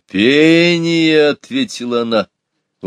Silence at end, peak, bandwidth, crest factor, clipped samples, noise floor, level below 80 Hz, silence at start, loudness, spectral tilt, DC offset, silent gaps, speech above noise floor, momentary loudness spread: 0 s; 0 dBFS; 10 kHz; 14 dB; under 0.1%; -43 dBFS; -62 dBFS; 0.15 s; -13 LUFS; -5 dB/octave; under 0.1%; none; 31 dB; 10 LU